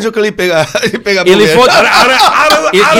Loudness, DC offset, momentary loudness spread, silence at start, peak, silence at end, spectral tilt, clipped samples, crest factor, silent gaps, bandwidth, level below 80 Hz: -7 LUFS; under 0.1%; 7 LU; 0 s; 0 dBFS; 0 s; -3 dB/octave; 0.3%; 8 dB; none; 17 kHz; -42 dBFS